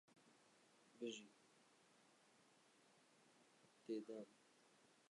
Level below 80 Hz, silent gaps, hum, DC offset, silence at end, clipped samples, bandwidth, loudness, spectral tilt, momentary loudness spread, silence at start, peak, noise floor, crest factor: under -90 dBFS; none; none; under 0.1%; 0.15 s; under 0.1%; 11 kHz; -54 LUFS; -4 dB/octave; 14 LU; 0.1 s; -38 dBFS; -75 dBFS; 22 dB